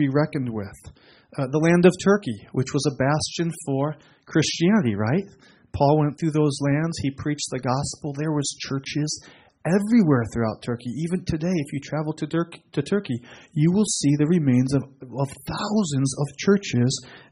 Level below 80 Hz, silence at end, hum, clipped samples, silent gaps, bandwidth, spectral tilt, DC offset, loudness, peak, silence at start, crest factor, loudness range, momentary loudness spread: -52 dBFS; 0.15 s; none; under 0.1%; none; 11.5 kHz; -6 dB/octave; under 0.1%; -23 LUFS; -2 dBFS; 0 s; 20 dB; 3 LU; 10 LU